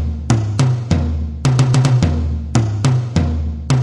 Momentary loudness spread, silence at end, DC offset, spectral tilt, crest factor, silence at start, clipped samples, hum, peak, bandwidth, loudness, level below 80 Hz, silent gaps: 6 LU; 0 s; 0.2%; -6.5 dB/octave; 12 dB; 0 s; under 0.1%; none; -2 dBFS; 11 kHz; -17 LUFS; -28 dBFS; none